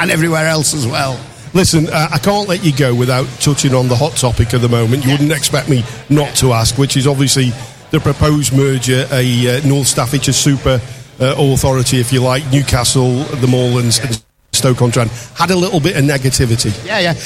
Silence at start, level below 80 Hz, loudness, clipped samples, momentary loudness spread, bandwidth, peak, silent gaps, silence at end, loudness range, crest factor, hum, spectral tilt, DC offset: 0 s; -32 dBFS; -13 LUFS; under 0.1%; 5 LU; 16 kHz; 0 dBFS; none; 0 s; 1 LU; 12 dB; none; -4.5 dB/octave; under 0.1%